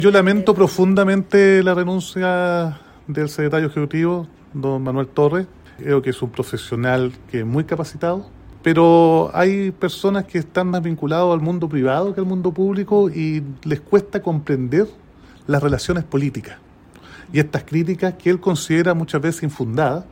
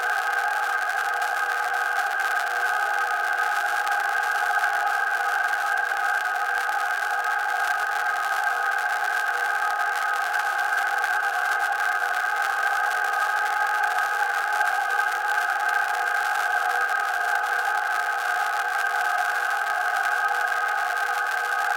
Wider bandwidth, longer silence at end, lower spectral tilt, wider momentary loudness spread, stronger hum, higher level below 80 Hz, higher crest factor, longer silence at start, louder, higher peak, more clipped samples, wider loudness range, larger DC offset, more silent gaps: about the same, 16.5 kHz vs 17 kHz; about the same, 0.05 s vs 0 s; first, -7 dB/octave vs 2 dB/octave; first, 10 LU vs 1 LU; neither; first, -48 dBFS vs -82 dBFS; about the same, 18 dB vs 18 dB; about the same, 0 s vs 0 s; first, -19 LUFS vs -23 LUFS; first, -2 dBFS vs -8 dBFS; neither; first, 5 LU vs 1 LU; neither; neither